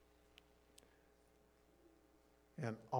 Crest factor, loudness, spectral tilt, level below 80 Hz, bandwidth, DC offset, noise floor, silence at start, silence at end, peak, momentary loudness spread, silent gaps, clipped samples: 26 dB; -49 LUFS; -7 dB/octave; -78 dBFS; 19.5 kHz; under 0.1%; -72 dBFS; 2.55 s; 0 s; -26 dBFS; 20 LU; none; under 0.1%